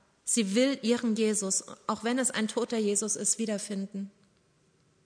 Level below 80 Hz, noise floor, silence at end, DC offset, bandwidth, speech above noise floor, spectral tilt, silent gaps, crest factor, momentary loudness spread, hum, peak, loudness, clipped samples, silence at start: -76 dBFS; -67 dBFS; 0.95 s; under 0.1%; 11 kHz; 38 dB; -3 dB/octave; none; 16 dB; 9 LU; none; -14 dBFS; -29 LUFS; under 0.1%; 0.25 s